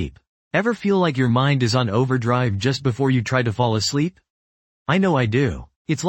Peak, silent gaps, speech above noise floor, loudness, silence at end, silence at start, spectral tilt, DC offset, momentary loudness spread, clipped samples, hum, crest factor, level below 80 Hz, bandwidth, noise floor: -4 dBFS; 0.29-0.51 s, 4.30-4.86 s, 5.76-5.85 s; over 71 dB; -20 LUFS; 0 s; 0 s; -6 dB/octave; under 0.1%; 6 LU; under 0.1%; none; 16 dB; -46 dBFS; 8.6 kHz; under -90 dBFS